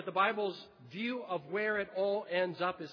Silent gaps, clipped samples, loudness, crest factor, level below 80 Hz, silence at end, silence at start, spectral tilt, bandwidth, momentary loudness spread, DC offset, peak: none; under 0.1%; -35 LUFS; 18 dB; -78 dBFS; 0 s; 0 s; -6.5 dB/octave; 5.4 kHz; 8 LU; under 0.1%; -16 dBFS